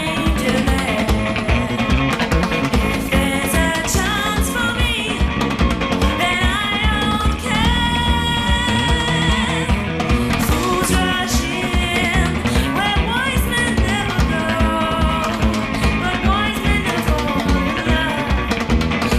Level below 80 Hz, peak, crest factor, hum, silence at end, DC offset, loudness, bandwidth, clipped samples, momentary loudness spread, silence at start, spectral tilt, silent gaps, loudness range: -24 dBFS; -4 dBFS; 12 dB; none; 0 s; under 0.1%; -18 LUFS; 15 kHz; under 0.1%; 2 LU; 0 s; -4.5 dB/octave; none; 1 LU